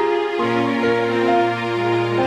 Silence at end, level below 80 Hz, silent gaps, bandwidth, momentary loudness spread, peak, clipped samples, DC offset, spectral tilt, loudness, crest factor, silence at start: 0 s; -58 dBFS; none; 9.8 kHz; 3 LU; -6 dBFS; under 0.1%; under 0.1%; -6.5 dB/octave; -19 LUFS; 12 dB; 0 s